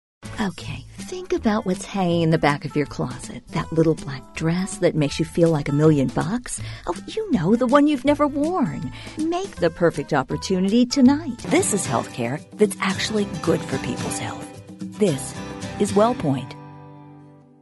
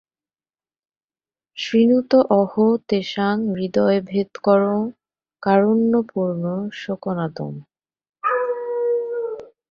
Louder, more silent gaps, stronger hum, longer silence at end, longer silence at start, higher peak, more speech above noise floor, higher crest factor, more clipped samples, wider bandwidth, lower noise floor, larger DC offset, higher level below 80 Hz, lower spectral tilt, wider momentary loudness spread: about the same, -22 LUFS vs -20 LUFS; second, none vs 8.09-8.13 s; neither; about the same, 0.3 s vs 0.25 s; second, 0.25 s vs 1.55 s; about the same, -4 dBFS vs -4 dBFS; second, 25 dB vs over 71 dB; about the same, 18 dB vs 18 dB; neither; first, 11.5 kHz vs 7 kHz; second, -47 dBFS vs under -90 dBFS; neither; first, -46 dBFS vs -64 dBFS; second, -5.5 dB/octave vs -7.5 dB/octave; about the same, 14 LU vs 12 LU